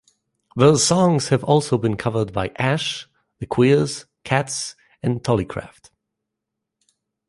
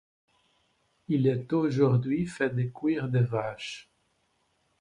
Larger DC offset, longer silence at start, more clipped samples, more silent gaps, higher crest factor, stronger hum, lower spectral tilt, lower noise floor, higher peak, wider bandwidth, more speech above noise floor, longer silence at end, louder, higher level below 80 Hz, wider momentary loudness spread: neither; second, 0.55 s vs 1.1 s; neither; neither; about the same, 20 dB vs 18 dB; neither; second, -5 dB/octave vs -8 dB/octave; first, -82 dBFS vs -72 dBFS; first, -2 dBFS vs -12 dBFS; about the same, 11.5 kHz vs 10.5 kHz; first, 62 dB vs 46 dB; first, 1.6 s vs 1 s; first, -20 LUFS vs -28 LUFS; first, -50 dBFS vs -62 dBFS; first, 16 LU vs 11 LU